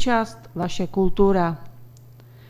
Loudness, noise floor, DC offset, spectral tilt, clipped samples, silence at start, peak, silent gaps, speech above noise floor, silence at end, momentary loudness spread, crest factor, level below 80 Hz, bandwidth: -23 LUFS; -46 dBFS; under 0.1%; -6.5 dB/octave; under 0.1%; 0 s; -4 dBFS; none; 25 dB; 0.35 s; 11 LU; 18 dB; -38 dBFS; 15.5 kHz